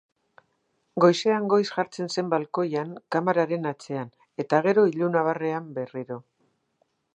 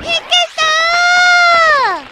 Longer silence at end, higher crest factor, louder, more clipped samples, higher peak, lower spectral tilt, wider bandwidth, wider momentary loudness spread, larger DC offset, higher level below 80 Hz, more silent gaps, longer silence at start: first, 0.95 s vs 0.05 s; first, 22 dB vs 12 dB; second, -25 LUFS vs -9 LUFS; neither; second, -4 dBFS vs 0 dBFS; first, -6 dB/octave vs 0.5 dB/octave; second, 9.6 kHz vs 13 kHz; first, 14 LU vs 5 LU; neither; second, -80 dBFS vs -48 dBFS; neither; first, 0.95 s vs 0 s